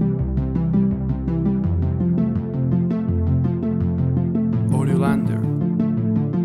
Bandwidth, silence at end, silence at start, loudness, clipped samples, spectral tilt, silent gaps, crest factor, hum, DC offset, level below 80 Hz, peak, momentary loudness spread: 11.5 kHz; 0 s; 0 s; -21 LUFS; under 0.1%; -10 dB/octave; none; 14 dB; none; under 0.1%; -34 dBFS; -6 dBFS; 3 LU